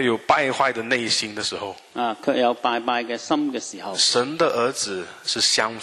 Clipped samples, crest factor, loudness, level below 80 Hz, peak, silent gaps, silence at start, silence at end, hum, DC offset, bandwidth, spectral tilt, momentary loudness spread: under 0.1%; 20 dB; -22 LUFS; -66 dBFS; -2 dBFS; none; 0 s; 0 s; none; under 0.1%; 13 kHz; -2 dB/octave; 9 LU